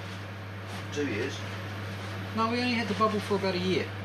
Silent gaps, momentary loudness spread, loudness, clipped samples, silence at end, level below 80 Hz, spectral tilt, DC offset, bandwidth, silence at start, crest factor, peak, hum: none; 12 LU; -31 LUFS; under 0.1%; 0 s; -68 dBFS; -5.5 dB/octave; under 0.1%; 14 kHz; 0 s; 18 dB; -12 dBFS; none